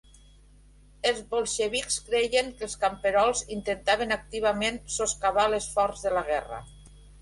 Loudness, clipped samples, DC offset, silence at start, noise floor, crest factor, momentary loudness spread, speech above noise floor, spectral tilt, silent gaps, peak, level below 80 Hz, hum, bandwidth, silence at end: -27 LUFS; under 0.1%; under 0.1%; 1.05 s; -55 dBFS; 18 dB; 6 LU; 27 dB; -2 dB/octave; none; -10 dBFS; -50 dBFS; 50 Hz at -50 dBFS; 11.5 kHz; 0 s